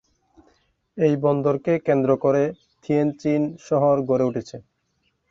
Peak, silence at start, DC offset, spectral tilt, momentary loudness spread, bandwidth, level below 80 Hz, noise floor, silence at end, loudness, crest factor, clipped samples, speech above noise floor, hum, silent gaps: -6 dBFS; 0.95 s; under 0.1%; -8.5 dB/octave; 13 LU; 7.6 kHz; -62 dBFS; -70 dBFS; 0.7 s; -22 LUFS; 16 dB; under 0.1%; 50 dB; none; none